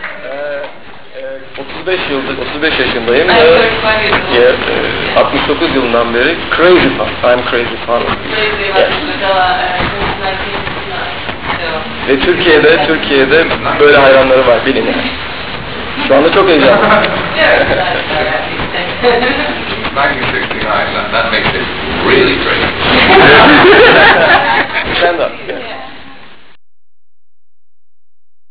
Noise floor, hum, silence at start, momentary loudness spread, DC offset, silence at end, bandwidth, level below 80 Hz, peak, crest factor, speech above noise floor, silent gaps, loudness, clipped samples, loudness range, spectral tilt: -36 dBFS; none; 0 s; 14 LU; 4%; 2.35 s; 4 kHz; -32 dBFS; 0 dBFS; 10 dB; 27 dB; none; -9 LUFS; under 0.1%; 8 LU; -8 dB/octave